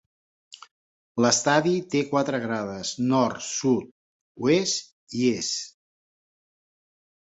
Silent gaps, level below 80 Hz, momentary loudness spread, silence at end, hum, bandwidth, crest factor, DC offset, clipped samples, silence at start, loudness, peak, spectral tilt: 3.91-4.35 s, 4.92-5.07 s; -66 dBFS; 9 LU; 1.7 s; none; 8.2 kHz; 22 dB; under 0.1%; under 0.1%; 1.15 s; -24 LUFS; -6 dBFS; -4 dB/octave